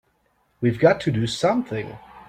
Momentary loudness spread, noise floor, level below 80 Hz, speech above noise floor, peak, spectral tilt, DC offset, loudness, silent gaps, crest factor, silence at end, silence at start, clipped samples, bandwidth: 12 LU; -66 dBFS; -54 dBFS; 45 dB; -2 dBFS; -6 dB/octave; under 0.1%; -22 LUFS; none; 20 dB; 0.1 s; 0.6 s; under 0.1%; 14 kHz